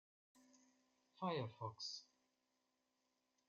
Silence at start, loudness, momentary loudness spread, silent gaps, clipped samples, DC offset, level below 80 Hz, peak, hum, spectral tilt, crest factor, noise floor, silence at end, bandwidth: 0.35 s; -48 LUFS; 5 LU; none; under 0.1%; under 0.1%; under -90 dBFS; -30 dBFS; none; -4 dB/octave; 22 dB; -87 dBFS; 1.45 s; 7.4 kHz